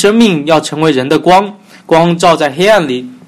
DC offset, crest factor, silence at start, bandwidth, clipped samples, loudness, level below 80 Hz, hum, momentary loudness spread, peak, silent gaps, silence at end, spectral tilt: under 0.1%; 10 dB; 0 s; 15 kHz; 0.5%; -9 LUFS; -46 dBFS; none; 4 LU; 0 dBFS; none; 0.1 s; -5 dB/octave